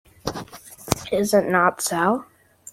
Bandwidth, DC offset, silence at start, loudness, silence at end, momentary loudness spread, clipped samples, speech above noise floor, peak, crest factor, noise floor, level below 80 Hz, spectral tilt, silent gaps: 16.5 kHz; under 0.1%; 0.25 s; -22 LUFS; 0.5 s; 17 LU; under 0.1%; 20 dB; 0 dBFS; 24 dB; -40 dBFS; -52 dBFS; -4 dB/octave; none